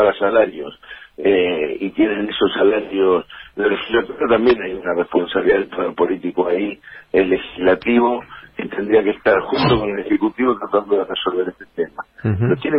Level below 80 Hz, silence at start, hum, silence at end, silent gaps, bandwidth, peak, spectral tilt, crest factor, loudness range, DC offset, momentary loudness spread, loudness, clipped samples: -48 dBFS; 0 s; none; 0 s; none; 5.6 kHz; -2 dBFS; -9 dB/octave; 14 dB; 2 LU; under 0.1%; 11 LU; -18 LUFS; under 0.1%